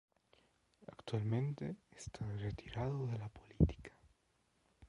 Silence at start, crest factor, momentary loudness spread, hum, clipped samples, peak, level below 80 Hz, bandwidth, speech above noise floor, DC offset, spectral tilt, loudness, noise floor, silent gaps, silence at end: 0.8 s; 24 dB; 19 LU; none; under 0.1%; -18 dBFS; -52 dBFS; 11 kHz; 39 dB; under 0.1%; -7.5 dB/octave; -41 LUFS; -78 dBFS; none; 0.05 s